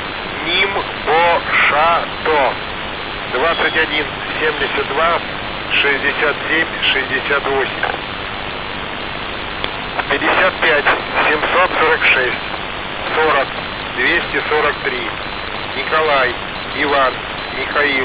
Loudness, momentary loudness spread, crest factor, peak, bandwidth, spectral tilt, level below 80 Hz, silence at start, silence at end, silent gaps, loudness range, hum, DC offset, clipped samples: -16 LUFS; 10 LU; 16 dB; 0 dBFS; 4 kHz; -7 dB/octave; -40 dBFS; 0 s; 0 s; none; 3 LU; none; under 0.1%; under 0.1%